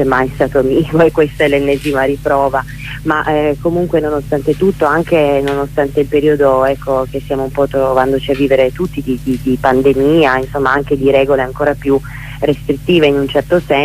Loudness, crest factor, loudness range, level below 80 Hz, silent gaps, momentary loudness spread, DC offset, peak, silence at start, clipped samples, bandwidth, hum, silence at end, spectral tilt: -13 LUFS; 12 dB; 2 LU; -32 dBFS; none; 6 LU; under 0.1%; 0 dBFS; 0 s; under 0.1%; 16 kHz; none; 0 s; -7 dB/octave